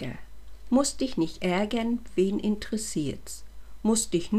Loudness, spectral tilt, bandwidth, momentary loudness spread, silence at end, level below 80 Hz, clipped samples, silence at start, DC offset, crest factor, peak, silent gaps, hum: -28 LUFS; -4.5 dB/octave; 15.5 kHz; 14 LU; 0 s; -48 dBFS; under 0.1%; 0 s; 0.9%; 18 dB; -10 dBFS; none; none